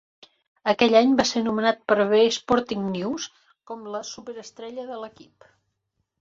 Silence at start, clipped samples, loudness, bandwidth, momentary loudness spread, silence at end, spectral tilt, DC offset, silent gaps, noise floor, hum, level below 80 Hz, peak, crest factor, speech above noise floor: 0.65 s; under 0.1%; -22 LUFS; 7.8 kHz; 20 LU; 1.1 s; -4 dB/octave; under 0.1%; none; -77 dBFS; none; -62 dBFS; -4 dBFS; 20 dB; 54 dB